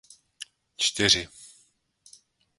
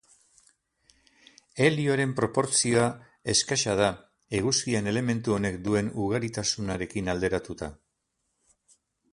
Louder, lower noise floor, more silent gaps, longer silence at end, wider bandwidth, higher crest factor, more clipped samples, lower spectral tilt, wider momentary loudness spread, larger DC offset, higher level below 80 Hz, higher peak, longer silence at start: first, -23 LUFS vs -26 LUFS; second, -65 dBFS vs -78 dBFS; neither; second, 1.1 s vs 1.4 s; about the same, 12 kHz vs 11.5 kHz; about the same, 26 dB vs 22 dB; neither; second, -1.5 dB/octave vs -4 dB/octave; first, 23 LU vs 9 LU; neither; about the same, -56 dBFS vs -54 dBFS; about the same, -6 dBFS vs -8 dBFS; second, 0.4 s vs 1.55 s